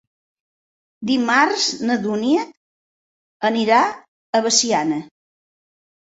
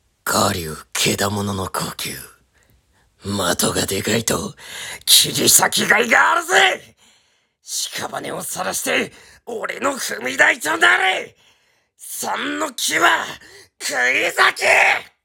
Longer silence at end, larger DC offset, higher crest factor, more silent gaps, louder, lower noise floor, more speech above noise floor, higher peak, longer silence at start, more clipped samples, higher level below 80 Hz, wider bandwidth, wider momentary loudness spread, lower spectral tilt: first, 1.1 s vs 0.2 s; neither; about the same, 20 dB vs 20 dB; first, 2.57-3.40 s, 4.08-4.33 s vs none; about the same, -18 LUFS vs -17 LUFS; first, under -90 dBFS vs -61 dBFS; first, over 72 dB vs 42 dB; about the same, -2 dBFS vs 0 dBFS; first, 1 s vs 0.25 s; neither; second, -66 dBFS vs -54 dBFS; second, 8.4 kHz vs 18 kHz; second, 10 LU vs 15 LU; about the same, -2.5 dB/octave vs -1.5 dB/octave